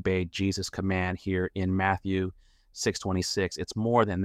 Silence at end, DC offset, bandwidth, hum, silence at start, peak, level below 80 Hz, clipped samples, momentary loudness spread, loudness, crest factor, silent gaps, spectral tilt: 0 s; under 0.1%; 15 kHz; none; 0 s; -10 dBFS; -52 dBFS; under 0.1%; 5 LU; -29 LUFS; 18 dB; none; -5 dB/octave